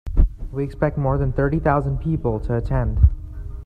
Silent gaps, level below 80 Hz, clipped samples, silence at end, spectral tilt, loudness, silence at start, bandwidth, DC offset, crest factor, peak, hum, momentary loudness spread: none; -24 dBFS; under 0.1%; 0 s; -11 dB/octave; -22 LUFS; 0.05 s; 4.7 kHz; under 0.1%; 18 dB; -2 dBFS; none; 8 LU